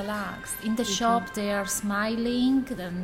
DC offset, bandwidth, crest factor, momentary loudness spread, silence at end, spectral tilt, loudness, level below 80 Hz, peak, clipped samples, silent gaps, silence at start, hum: under 0.1%; 16.5 kHz; 14 dB; 8 LU; 0 s; -4 dB/octave; -27 LUFS; -52 dBFS; -14 dBFS; under 0.1%; none; 0 s; none